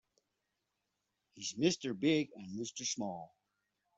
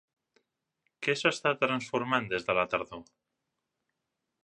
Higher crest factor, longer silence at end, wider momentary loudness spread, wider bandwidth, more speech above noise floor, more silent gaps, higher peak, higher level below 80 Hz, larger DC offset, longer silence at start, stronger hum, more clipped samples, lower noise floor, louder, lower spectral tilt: about the same, 22 dB vs 24 dB; second, 0.7 s vs 1.45 s; first, 11 LU vs 7 LU; second, 8.2 kHz vs 11 kHz; second, 50 dB vs 55 dB; neither; second, -18 dBFS vs -10 dBFS; second, -78 dBFS vs -68 dBFS; neither; first, 1.35 s vs 1 s; neither; neither; about the same, -86 dBFS vs -85 dBFS; second, -36 LUFS vs -29 LUFS; about the same, -4 dB/octave vs -4 dB/octave